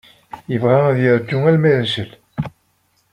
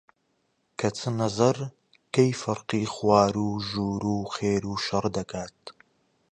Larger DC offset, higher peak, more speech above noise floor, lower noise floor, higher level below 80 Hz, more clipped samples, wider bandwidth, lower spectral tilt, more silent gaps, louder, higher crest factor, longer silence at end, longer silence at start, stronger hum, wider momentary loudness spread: neither; first, -2 dBFS vs -6 dBFS; about the same, 47 dB vs 47 dB; second, -62 dBFS vs -73 dBFS; about the same, -54 dBFS vs -56 dBFS; neither; about the same, 11 kHz vs 10 kHz; first, -8 dB/octave vs -5.5 dB/octave; neither; first, -16 LUFS vs -26 LUFS; about the same, 16 dB vs 20 dB; about the same, 0.65 s vs 0.6 s; second, 0.35 s vs 0.8 s; neither; about the same, 15 LU vs 15 LU